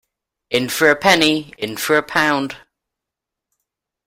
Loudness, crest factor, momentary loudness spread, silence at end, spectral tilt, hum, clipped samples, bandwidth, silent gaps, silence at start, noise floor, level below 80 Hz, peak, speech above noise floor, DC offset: -16 LUFS; 20 dB; 13 LU; 1.5 s; -3 dB/octave; none; under 0.1%; 16.5 kHz; none; 0.5 s; -84 dBFS; -56 dBFS; 0 dBFS; 67 dB; under 0.1%